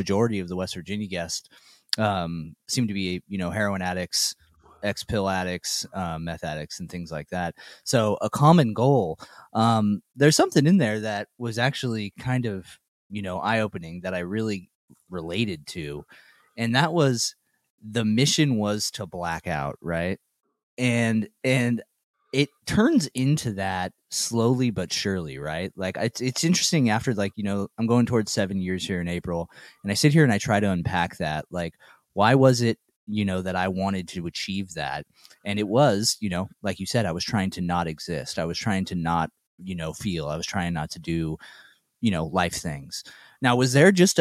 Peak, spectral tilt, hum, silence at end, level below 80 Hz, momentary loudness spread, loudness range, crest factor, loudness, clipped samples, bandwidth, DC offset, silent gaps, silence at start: -2 dBFS; -5 dB/octave; none; 0 s; -54 dBFS; 13 LU; 6 LU; 22 dB; -25 LUFS; under 0.1%; 15.5 kHz; under 0.1%; 12.88-13.10 s, 14.75-14.88 s, 17.70-17.78 s, 20.63-20.77 s, 22.04-22.14 s, 32.96-33.07 s, 39.47-39.58 s; 0 s